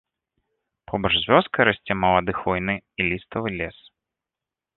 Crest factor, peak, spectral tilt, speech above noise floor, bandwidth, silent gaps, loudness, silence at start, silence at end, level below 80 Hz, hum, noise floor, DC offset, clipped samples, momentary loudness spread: 22 dB; -2 dBFS; -9 dB/octave; 66 dB; 4.3 kHz; none; -22 LUFS; 0.9 s; 1.05 s; -48 dBFS; none; -88 dBFS; under 0.1%; under 0.1%; 11 LU